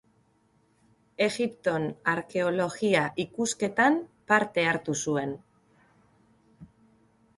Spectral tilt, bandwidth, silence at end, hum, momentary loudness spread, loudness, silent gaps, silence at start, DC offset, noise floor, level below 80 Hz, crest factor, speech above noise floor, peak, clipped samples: -4 dB/octave; 11.5 kHz; 0.7 s; none; 7 LU; -27 LUFS; none; 1.2 s; under 0.1%; -67 dBFS; -68 dBFS; 22 dB; 40 dB; -8 dBFS; under 0.1%